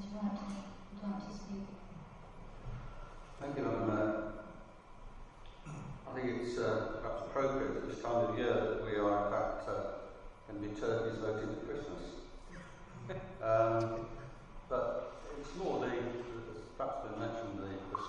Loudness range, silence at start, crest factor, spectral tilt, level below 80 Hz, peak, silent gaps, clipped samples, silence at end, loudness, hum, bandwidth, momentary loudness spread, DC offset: 6 LU; 0 s; 20 dB; -7 dB/octave; -56 dBFS; -18 dBFS; none; under 0.1%; 0 s; -38 LUFS; none; 10.5 kHz; 19 LU; under 0.1%